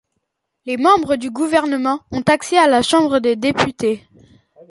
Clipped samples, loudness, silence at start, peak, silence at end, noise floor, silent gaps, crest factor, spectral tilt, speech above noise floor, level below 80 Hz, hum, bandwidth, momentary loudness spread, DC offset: under 0.1%; -16 LUFS; 0.65 s; -2 dBFS; 0.75 s; -74 dBFS; none; 16 dB; -4.5 dB/octave; 57 dB; -52 dBFS; none; 11.5 kHz; 8 LU; under 0.1%